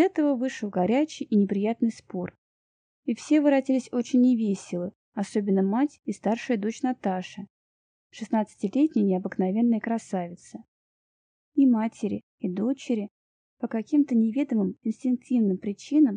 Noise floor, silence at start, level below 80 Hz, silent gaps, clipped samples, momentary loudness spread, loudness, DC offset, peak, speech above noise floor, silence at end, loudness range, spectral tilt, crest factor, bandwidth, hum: under -90 dBFS; 0 s; -74 dBFS; 2.38-3.03 s, 4.95-5.12 s, 7.50-8.10 s, 10.68-11.52 s, 12.23-12.38 s, 13.11-13.57 s; under 0.1%; 13 LU; -26 LUFS; under 0.1%; -10 dBFS; over 65 dB; 0 s; 3 LU; -7 dB/octave; 16 dB; 10 kHz; none